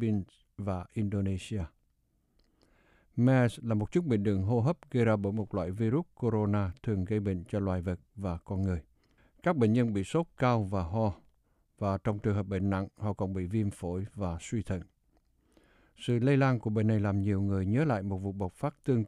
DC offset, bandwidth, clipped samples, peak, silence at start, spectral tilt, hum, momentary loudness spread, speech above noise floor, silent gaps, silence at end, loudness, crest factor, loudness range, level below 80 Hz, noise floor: under 0.1%; 11.5 kHz; under 0.1%; -14 dBFS; 0 s; -8 dB/octave; none; 10 LU; 43 dB; none; 0 s; -31 LUFS; 18 dB; 4 LU; -54 dBFS; -73 dBFS